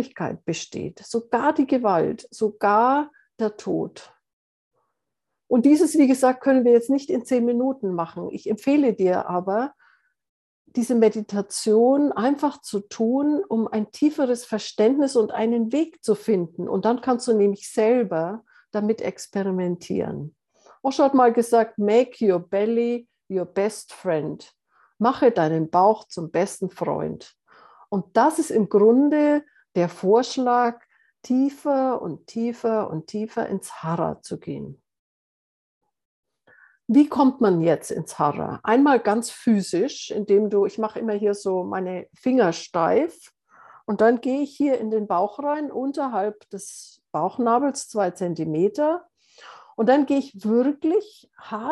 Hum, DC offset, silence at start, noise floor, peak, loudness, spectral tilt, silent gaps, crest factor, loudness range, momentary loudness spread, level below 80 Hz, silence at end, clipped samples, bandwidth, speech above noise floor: none; under 0.1%; 0 s; -83 dBFS; -4 dBFS; -22 LUFS; -6 dB/octave; 4.33-4.71 s, 10.29-10.65 s, 34.99-35.81 s, 36.05-36.23 s; 18 dB; 5 LU; 12 LU; -70 dBFS; 0 s; under 0.1%; 12.5 kHz; 61 dB